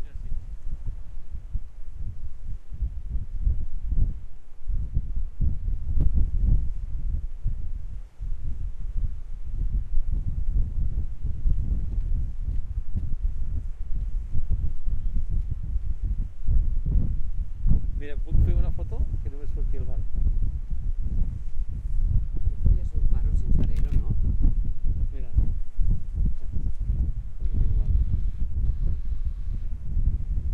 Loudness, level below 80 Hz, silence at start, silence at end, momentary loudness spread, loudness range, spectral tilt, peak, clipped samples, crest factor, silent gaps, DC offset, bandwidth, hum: -31 LUFS; -24 dBFS; 0 s; 0 s; 12 LU; 6 LU; -10 dB/octave; -6 dBFS; under 0.1%; 16 dB; none; under 0.1%; 2 kHz; none